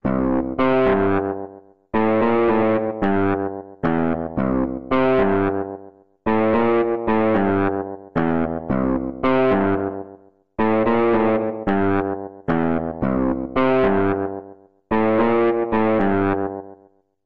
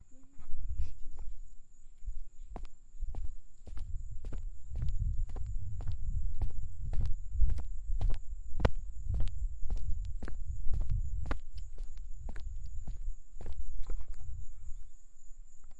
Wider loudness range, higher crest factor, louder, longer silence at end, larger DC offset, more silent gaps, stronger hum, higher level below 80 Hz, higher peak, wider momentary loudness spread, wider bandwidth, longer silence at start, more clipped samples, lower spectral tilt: second, 2 LU vs 10 LU; second, 12 dB vs 18 dB; first, -20 LUFS vs -42 LUFS; about the same, 0 s vs 0 s; first, 1% vs under 0.1%; neither; neither; second, -44 dBFS vs -36 dBFS; first, -8 dBFS vs -12 dBFS; second, 10 LU vs 15 LU; second, 5.2 kHz vs 7.4 kHz; about the same, 0 s vs 0.1 s; neither; first, -10 dB/octave vs -7 dB/octave